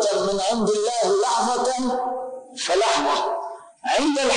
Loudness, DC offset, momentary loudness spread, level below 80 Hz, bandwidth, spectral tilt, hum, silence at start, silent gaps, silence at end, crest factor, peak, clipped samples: -22 LUFS; under 0.1%; 11 LU; -56 dBFS; 10.5 kHz; -2.5 dB/octave; none; 0 s; none; 0 s; 10 dB; -12 dBFS; under 0.1%